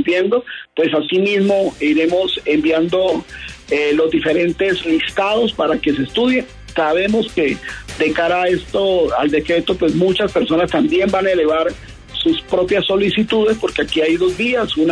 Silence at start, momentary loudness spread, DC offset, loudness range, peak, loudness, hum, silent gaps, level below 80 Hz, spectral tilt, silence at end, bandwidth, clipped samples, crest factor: 0 s; 5 LU; under 0.1%; 1 LU; -4 dBFS; -16 LUFS; none; none; -42 dBFS; -5.5 dB/octave; 0 s; 11 kHz; under 0.1%; 12 dB